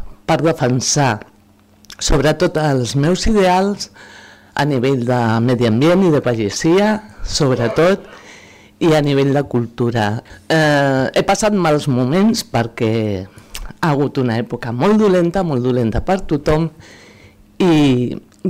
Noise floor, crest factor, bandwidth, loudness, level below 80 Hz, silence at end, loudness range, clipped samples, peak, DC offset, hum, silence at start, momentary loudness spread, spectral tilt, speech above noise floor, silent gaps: -50 dBFS; 10 dB; 16 kHz; -16 LUFS; -34 dBFS; 0 s; 2 LU; under 0.1%; -6 dBFS; under 0.1%; none; 0 s; 9 LU; -5.5 dB/octave; 35 dB; none